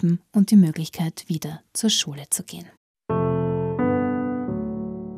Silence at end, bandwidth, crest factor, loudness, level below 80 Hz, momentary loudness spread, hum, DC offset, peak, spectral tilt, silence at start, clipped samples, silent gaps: 0 s; 16 kHz; 16 dB; -23 LUFS; -54 dBFS; 12 LU; none; under 0.1%; -6 dBFS; -5 dB/octave; 0 s; under 0.1%; 2.77-2.95 s